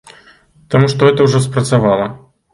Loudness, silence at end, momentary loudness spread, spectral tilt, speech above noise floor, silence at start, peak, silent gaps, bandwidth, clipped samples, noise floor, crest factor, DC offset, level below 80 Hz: -13 LUFS; 0.35 s; 7 LU; -6.5 dB/octave; 35 dB; 0.7 s; 0 dBFS; none; 11.5 kHz; under 0.1%; -47 dBFS; 14 dB; under 0.1%; -46 dBFS